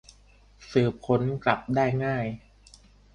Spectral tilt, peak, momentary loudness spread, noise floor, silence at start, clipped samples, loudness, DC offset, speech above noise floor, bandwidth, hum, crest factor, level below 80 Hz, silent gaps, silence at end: -7.5 dB/octave; -6 dBFS; 7 LU; -56 dBFS; 0.6 s; under 0.1%; -26 LUFS; under 0.1%; 31 dB; 10 kHz; 50 Hz at -50 dBFS; 22 dB; -54 dBFS; none; 0.75 s